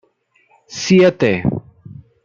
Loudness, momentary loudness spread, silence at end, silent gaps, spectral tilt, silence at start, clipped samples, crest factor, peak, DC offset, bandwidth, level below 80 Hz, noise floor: -15 LUFS; 17 LU; 0.65 s; none; -6 dB/octave; 0.7 s; under 0.1%; 16 dB; -2 dBFS; under 0.1%; 7.4 kHz; -50 dBFS; -59 dBFS